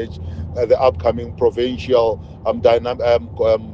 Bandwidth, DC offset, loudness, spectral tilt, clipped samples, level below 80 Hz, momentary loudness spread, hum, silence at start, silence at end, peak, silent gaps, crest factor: 7.4 kHz; under 0.1%; -18 LUFS; -7.5 dB/octave; under 0.1%; -40 dBFS; 9 LU; none; 0 s; 0 s; -2 dBFS; none; 16 dB